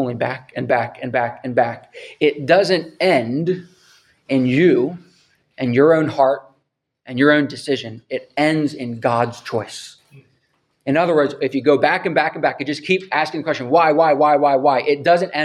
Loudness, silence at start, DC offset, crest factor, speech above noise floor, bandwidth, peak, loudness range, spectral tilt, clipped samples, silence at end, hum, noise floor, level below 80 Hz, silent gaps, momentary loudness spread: -18 LUFS; 0 s; under 0.1%; 18 dB; 53 dB; 12 kHz; 0 dBFS; 4 LU; -6 dB/octave; under 0.1%; 0 s; none; -70 dBFS; -66 dBFS; none; 12 LU